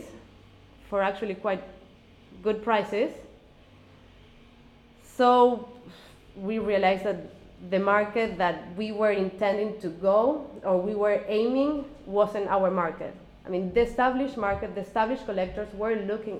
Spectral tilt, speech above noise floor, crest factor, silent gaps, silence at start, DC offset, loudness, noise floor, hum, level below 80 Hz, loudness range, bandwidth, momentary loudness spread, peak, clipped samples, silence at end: -6.5 dB/octave; 28 dB; 20 dB; none; 0 s; under 0.1%; -27 LUFS; -54 dBFS; none; -54 dBFS; 5 LU; 12.5 kHz; 11 LU; -8 dBFS; under 0.1%; 0 s